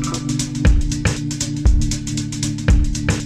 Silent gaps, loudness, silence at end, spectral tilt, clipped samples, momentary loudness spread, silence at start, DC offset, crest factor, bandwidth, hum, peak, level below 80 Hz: none; -20 LUFS; 0 s; -5 dB/octave; under 0.1%; 5 LU; 0 s; under 0.1%; 16 dB; 13 kHz; none; -2 dBFS; -20 dBFS